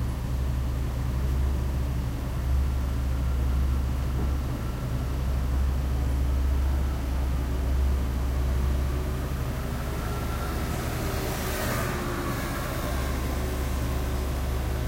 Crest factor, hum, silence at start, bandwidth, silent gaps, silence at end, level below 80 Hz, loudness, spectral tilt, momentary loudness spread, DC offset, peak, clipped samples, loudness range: 12 dB; none; 0 s; 16 kHz; none; 0 s; -28 dBFS; -29 LUFS; -6 dB/octave; 4 LU; under 0.1%; -14 dBFS; under 0.1%; 2 LU